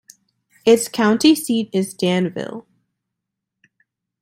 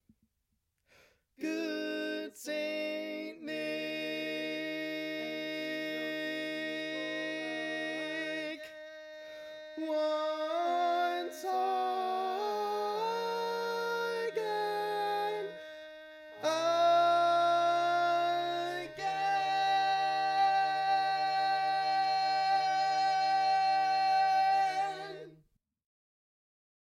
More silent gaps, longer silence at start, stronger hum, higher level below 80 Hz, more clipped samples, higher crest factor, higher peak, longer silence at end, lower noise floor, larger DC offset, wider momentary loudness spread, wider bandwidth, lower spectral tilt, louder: neither; second, 0.65 s vs 1.4 s; neither; first, -64 dBFS vs -82 dBFS; neither; about the same, 18 dB vs 16 dB; first, -2 dBFS vs -18 dBFS; about the same, 1.6 s vs 1.5 s; about the same, -81 dBFS vs -81 dBFS; neither; about the same, 14 LU vs 12 LU; about the same, 16.5 kHz vs 16 kHz; first, -4.5 dB/octave vs -3 dB/octave; first, -18 LUFS vs -32 LUFS